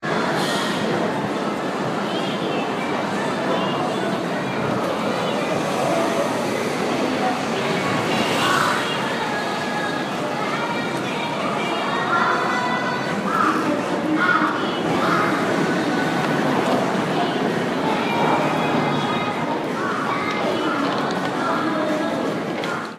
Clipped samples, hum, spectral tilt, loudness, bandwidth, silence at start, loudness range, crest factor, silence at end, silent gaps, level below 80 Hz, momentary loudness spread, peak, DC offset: under 0.1%; none; -5 dB/octave; -21 LUFS; 15.5 kHz; 0 s; 3 LU; 16 dB; 0 s; none; -60 dBFS; 5 LU; -6 dBFS; under 0.1%